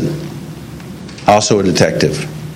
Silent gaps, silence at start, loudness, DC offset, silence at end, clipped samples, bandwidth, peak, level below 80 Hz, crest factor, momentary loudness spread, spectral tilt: none; 0 s; -13 LUFS; under 0.1%; 0 s; 0.2%; 16.5 kHz; 0 dBFS; -42 dBFS; 16 dB; 19 LU; -4.5 dB/octave